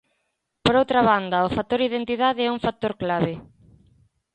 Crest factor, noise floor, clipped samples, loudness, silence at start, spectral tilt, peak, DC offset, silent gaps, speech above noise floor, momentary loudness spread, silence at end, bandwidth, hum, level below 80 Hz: 18 dB; -75 dBFS; under 0.1%; -22 LUFS; 0.65 s; -6.5 dB/octave; -4 dBFS; under 0.1%; none; 53 dB; 7 LU; 0.9 s; 9.2 kHz; none; -52 dBFS